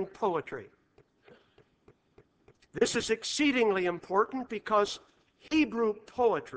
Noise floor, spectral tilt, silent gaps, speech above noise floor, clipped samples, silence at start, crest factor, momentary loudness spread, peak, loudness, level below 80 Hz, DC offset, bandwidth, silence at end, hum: -65 dBFS; -3.5 dB/octave; none; 36 dB; under 0.1%; 0 s; 18 dB; 10 LU; -12 dBFS; -29 LUFS; -64 dBFS; under 0.1%; 8 kHz; 0 s; none